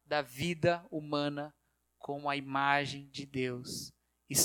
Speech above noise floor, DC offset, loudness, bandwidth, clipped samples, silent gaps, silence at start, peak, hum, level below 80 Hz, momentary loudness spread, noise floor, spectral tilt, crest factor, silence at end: 22 dB; under 0.1%; -35 LUFS; 19 kHz; under 0.1%; none; 0.1 s; -12 dBFS; none; -66 dBFS; 13 LU; -56 dBFS; -3.5 dB/octave; 22 dB; 0 s